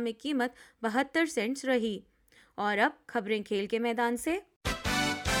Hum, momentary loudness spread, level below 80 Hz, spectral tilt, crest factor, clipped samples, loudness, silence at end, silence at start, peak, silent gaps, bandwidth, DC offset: none; 7 LU; -50 dBFS; -4 dB/octave; 18 dB; under 0.1%; -31 LUFS; 0 s; 0 s; -12 dBFS; 4.56-4.61 s; 18 kHz; under 0.1%